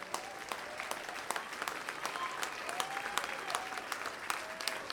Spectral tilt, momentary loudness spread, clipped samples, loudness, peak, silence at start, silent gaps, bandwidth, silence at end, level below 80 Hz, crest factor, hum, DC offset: -0.5 dB/octave; 4 LU; under 0.1%; -39 LUFS; -12 dBFS; 0 s; none; 19 kHz; 0 s; -74 dBFS; 28 dB; none; under 0.1%